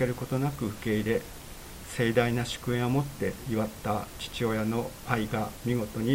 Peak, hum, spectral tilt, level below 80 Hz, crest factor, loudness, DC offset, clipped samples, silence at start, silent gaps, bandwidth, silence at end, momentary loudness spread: -8 dBFS; none; -6 dB/octave; -48 dBFS; 22 dB; -30 LUFS; under 0.1%; under 0.1%; 0 s; none; 16 kHz; 0 s; 8 LU